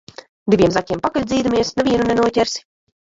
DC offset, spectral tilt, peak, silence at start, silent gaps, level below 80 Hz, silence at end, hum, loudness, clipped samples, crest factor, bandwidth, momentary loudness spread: under 0.1%; -5 dB/octave; -2 dBFS; 0.45 s; none; -44 dBFS; 0.5 s; none; -18 LUFS; under 0.1%; 16 dB; 7.8 kHz; 6 LU